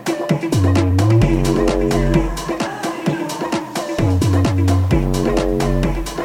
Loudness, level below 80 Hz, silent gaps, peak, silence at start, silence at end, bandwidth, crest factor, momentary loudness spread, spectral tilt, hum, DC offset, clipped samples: -17 LUFS; -26 dBFS; none; -2 dBFS; 0 s; 0 s; 16 kHz; 14 dB; 8 LU; -6.5 dB/octave; none; under 0.1%; under 0.1%